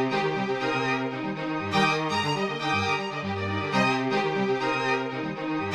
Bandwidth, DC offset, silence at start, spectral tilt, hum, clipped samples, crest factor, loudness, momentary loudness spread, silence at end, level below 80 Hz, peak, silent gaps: 12.5 kHz; under 0.1%; 0 s; -5 dB/octave; none; under 0.1%; 18 dB; -26 LUFS; 6 LU; 0 s; -64 dBFS; -10 dBFS; none